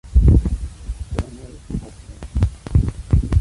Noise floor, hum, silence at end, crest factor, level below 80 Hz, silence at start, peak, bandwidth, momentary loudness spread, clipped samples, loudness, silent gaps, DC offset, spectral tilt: -36 dBFS; none; 0 s; 16 dB; -20 dBFS; 0.05 s; -2 dBFS; 11.5 kHz; 18 LU; under 0.1%; -21 LUFS; none; under 0.1%; -8.5 dB/octave